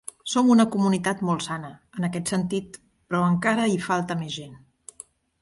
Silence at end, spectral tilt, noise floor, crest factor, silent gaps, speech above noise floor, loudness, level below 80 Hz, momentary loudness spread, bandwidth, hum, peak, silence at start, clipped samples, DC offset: 0.85 s; -5.5 dB/octave; -49 dBFS; 18 dB; none; 26 dB; -24 LUFS; -62 dBFS; 18 LU; 11.5 kHz; none; -6 dBFS; 0.25 s; under 0.1%; under 0.1%